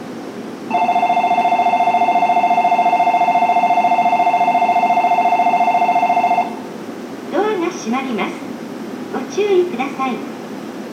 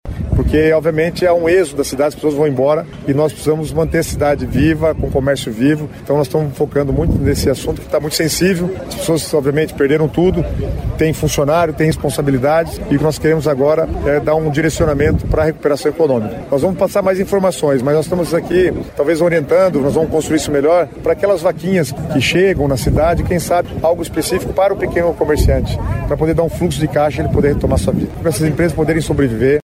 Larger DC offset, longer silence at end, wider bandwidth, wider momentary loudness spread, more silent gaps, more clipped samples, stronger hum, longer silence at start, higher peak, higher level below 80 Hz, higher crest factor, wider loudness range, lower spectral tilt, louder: neither; about the same, 0 s vs 0 s; second, 14.5 kHz vs 16 kHz; first, 14 LU vs 5 LU; neither; neither; neither; about the same, 0 s vs 0.05 s; about the same, -4 dBFS vs -4 dBFS; second, -72 dBFS vs -28 dBFS; about the same, 12 dB vs 12 dB; first, 7 LU vs 2 LU; about the same, -5 dB/octave vs -6 dB/octave; about the same, -16 LUFS vs -15 LUFS